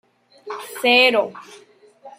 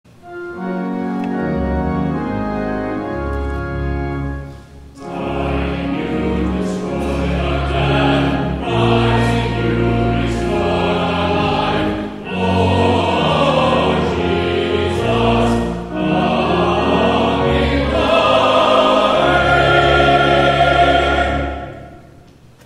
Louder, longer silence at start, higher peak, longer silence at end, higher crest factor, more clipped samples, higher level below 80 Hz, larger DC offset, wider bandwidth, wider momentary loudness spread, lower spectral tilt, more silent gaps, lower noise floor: about the same, -16 LUFS vs -16 LUFS; first, 0.45 s vs 0.25 s; about the same, -2 dBFS vs 0 dBFS; second, 0.1 s vs 0.65 s; about the same, 20 dB vs 16 dB; neither; second, -78 dBFS vs -28 dBFS; neither; first, 16 kHz vs 12.5 kHz; first, 20 LU vs 10 LU; second, -2 dB/octave vs -6.5 dB/octave; neither; about the same, -45 dBFS vs -43 dBFS